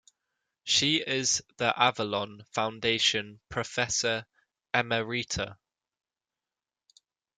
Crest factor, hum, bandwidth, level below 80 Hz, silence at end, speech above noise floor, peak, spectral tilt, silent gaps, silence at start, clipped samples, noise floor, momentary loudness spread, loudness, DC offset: 24 dB; none; 11 kHz; -62 dBFS; 1.85 s; over 61 dB; -6 dBFS; -2 dB/octave; none; 0.65 s; under 0.1%; under -90 dBFS; 10 LU; -28 LUFS; under 0.1%